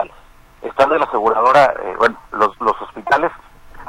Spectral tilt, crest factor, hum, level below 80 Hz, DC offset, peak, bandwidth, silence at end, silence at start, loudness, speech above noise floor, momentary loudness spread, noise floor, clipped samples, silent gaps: -4.5 dB/octave; 18 dB; none; -46 dBFS; under 0.1%; 0 dBFS; 15.5 kHz; 0 s; 0 s; -16 LUFS; 29 dB; 14 LU; -44 dBFS; under 0.1%; none